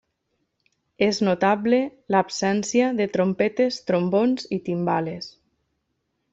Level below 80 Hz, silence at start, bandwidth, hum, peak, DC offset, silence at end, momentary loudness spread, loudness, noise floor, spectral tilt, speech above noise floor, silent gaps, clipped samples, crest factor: -66 dBFS; 1 s; 8 kHz; none; -6 dBFS; under 0.1%; 1.05 s; 6 LU; -22 LUFS; -75 dBFS; -5.5 dB/octave; 53 dB; none; under 0.1%; 18 dB